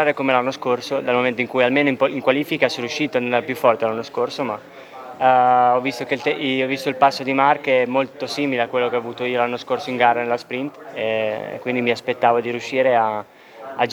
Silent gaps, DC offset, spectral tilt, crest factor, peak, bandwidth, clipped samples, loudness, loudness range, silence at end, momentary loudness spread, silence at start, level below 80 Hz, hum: none; under 0.1%; -5 dB/octave; 20 dB; 0 dBFS; 19.5 kHz; under 0.1%; -20 LUFS; 3 LU; 0 s; 9 LU; 0 s; -70 dBFS; none